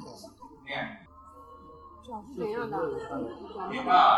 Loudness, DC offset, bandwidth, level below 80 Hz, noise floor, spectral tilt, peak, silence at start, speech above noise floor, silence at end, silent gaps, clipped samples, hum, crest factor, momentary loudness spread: -31 LUFS; under 0.1%; 12 kHz; -60 dBFS; -51 dBFS; -5 dB/octave; -8 dBFS; 0 s; 24 dB; 0 s; none; under 0.1%; none; 22 dB; 19 LU